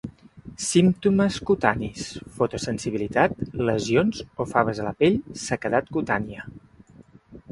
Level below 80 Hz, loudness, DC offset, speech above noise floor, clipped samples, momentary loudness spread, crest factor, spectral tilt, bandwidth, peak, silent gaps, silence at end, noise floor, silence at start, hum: -50 dBFS; -24 LUFS; under 0.1%; 28 dB; under 0.1%; 14 LU; 24 dB; -5.5 dB/octave; 11.5 kHz; -2 dBFS; none; 0 s; -51 dBFS; 0.05 s; none